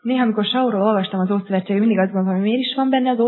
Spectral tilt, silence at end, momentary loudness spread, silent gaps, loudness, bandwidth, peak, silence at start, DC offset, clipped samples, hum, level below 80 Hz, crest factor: -10 dB/octave; 0 s; 3 LU; none; -19 LUFS; 4.3 kHz; -4 dBFS; 0.05 s; under 0.1%; under 0.1%; none; -80 dBFS; 14 dB